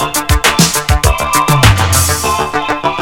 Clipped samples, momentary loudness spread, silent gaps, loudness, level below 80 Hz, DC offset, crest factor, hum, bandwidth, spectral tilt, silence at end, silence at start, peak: 0.4%; 6 LU; none; -11 LUFS; -20 dBFS; under 0.1%; 12 dB; none; 19.5 kHz; -3.5 dB/octave; 0 s; 0 s; 0 dBFS